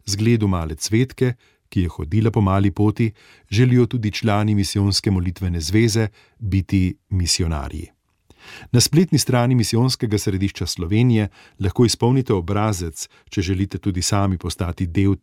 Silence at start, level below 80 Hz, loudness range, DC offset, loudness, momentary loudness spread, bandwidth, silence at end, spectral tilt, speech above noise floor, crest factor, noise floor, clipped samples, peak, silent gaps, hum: 0.05 s; -38 dBFS; 3 LU; under 0.1%; -20 LUFS; 9 LU; 16 kHz; 0.05 s; -5.5 dB/octave; 35 dB; 16 dB; -54 dBFS; under 0.1%; -4 dBFS; none; none